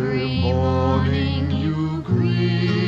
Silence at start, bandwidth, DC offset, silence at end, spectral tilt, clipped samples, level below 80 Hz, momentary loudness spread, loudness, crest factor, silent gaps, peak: 0 s; 7.4 kHz; under 0.1%; 0 s; -8 dB/octave; under 0.1%; -36 dBFS; 3 LU; -21 LUFS; 12 dB; none; -8 dBFS